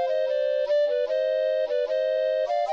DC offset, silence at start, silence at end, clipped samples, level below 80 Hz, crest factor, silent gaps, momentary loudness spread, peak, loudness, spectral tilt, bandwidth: under 0.1%; 0 s; 0 s; under 0.1%; -70 dBFS; 8 dB; none; 2 LU; -16 dBFS; -25 LUFS; -1 dB/octave; 6.8 kHz